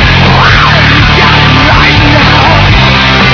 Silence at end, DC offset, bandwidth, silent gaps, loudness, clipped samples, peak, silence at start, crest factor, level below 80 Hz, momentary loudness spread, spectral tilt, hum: 0 s; under 0.1%; 5.4 kHz; none; -3 LUFS; 20%; 0 dBFS; 0 s; 4 dB; -14 dBFS; 1 LU; -5.5 dB/octave; none